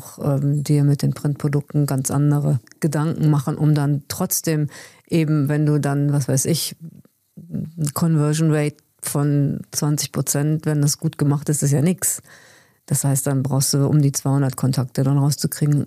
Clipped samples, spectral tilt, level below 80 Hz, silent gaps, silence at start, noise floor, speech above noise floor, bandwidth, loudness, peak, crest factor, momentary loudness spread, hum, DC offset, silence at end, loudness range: under 0.1%; -5.5 dB/octave; -58 dBFS; none; 0 s; -45 dBFS; 25 dB; 15.5 kHz; -20 LUFS; -8 dBFS; 12 dB; 6 LU; none; under 0.1%; 0 s; 2 LU